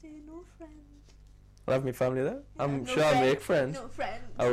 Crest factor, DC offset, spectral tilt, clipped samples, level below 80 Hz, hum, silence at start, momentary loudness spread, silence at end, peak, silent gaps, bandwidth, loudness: 14 dB; under 0.1%; -5.5 dB/octave; under 0.1%; -54 dBFS; none; 0.05 s; 23 LU; 0 s; -16 dBFS; none; 15.5 kHz; -29 LUFS